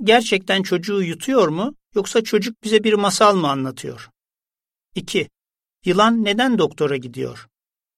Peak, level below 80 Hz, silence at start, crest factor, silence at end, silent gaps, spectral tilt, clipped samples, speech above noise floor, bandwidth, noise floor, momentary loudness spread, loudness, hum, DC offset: -2 dBFS; -62 dBFS; 0 s; 18 dB; 0.55 s; none; -4.5 dB/octave; under 0.1%; over 72 dB; 15 kHz; under -90 dBFS; 15 LU; -19 LUFS; none; under 0.1%